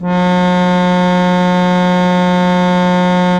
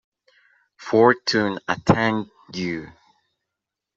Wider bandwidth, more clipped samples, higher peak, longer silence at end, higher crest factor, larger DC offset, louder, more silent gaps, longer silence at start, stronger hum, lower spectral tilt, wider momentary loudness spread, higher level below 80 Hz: first, 9.4 kHz vs 8 kHz; neither; about the same, -2 dBFS vs -2 dBFS; second, 0 s vs 1.1 s; second, 10 dB vs 20 dB; neither; first, -12 LUFS vs -21 LUFS; neither; second, 0 s vs 0.8 s; neither; first, -7 dB/octave vs -5.5 dB/octave; second, 0 LU vs 15 LU; first, -42 dBFS vs -56 dBFS